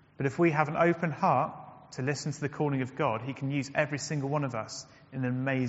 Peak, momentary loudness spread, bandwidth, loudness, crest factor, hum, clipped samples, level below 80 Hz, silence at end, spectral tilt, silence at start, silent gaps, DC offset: -8 dBFS; 11 LU; 8 kHz; -30 LUFS; 22 dB; none; under 0.1%; -68 dBFS; 0 s; -6 dB/octave; 0.2 s; none; under 0.1%